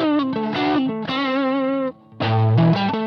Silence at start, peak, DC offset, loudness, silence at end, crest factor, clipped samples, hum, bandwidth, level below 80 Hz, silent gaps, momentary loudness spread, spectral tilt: 0 s; -6 dBFS; under 0.1%; -20 LUFS; 0 s; 14 dB; under 0.1%; none; 6.2 kHz; -56 dBFS; none; 7 LU; -8.5 dB/octave